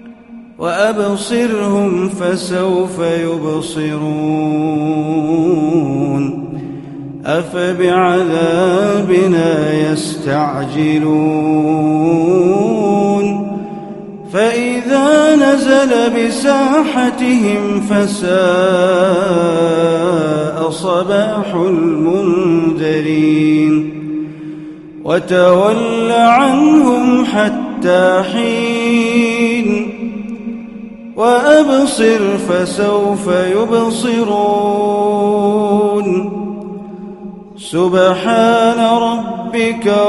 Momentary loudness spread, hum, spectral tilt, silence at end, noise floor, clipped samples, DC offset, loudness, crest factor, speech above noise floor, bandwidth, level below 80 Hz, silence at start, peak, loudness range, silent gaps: 13 LU; none; -6 dB/octave; 0 s; -35 dBFS; under 0.1%; under 0.1%; -13 LUFS; 12 dB; 23 dB; 11.5 kHz; -50 dBFS; 0.05 s; 0 dBFS; 4 LU; none